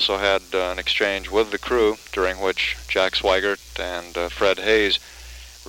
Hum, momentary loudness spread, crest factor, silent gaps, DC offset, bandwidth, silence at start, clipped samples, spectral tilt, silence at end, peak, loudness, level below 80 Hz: none; 10 LU; 18 dB; none; under 0.1%; 17 kHz; 0 s; under 0.1%; -3 dB/octave; 0 s; -4 dBFS; -21 LUFS; -42 dBFS